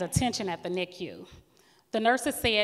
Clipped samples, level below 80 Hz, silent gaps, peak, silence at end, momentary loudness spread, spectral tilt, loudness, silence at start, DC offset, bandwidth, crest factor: under 0.1%; -52 dBFS; none; -10 dBFS; 0 s; 15 LU; -4 dB/octave; -29 LUFS; 0 s; under 0.1%; 16 kHz; 20 dB